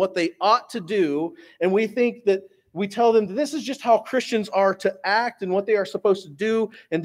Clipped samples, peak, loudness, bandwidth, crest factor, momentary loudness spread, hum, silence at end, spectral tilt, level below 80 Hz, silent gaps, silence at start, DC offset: under 0.1%; -4 dBFS; -23 LUFS; 15 kHz; 18 dB; 7 LU; none; 0 s; -5 dB/octave; -74 dBFS; none; 0 s; under 0.1%